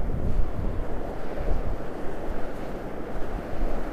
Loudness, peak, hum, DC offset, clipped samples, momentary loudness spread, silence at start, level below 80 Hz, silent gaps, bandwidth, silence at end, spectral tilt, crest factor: -34 LUFS; -10 dBFS; none; under 0.1%; under 0.1%; 5 LU; 0 s; -30 dBFS; none; 5 kHz; 0 s; -8 dB/octave; 12 dB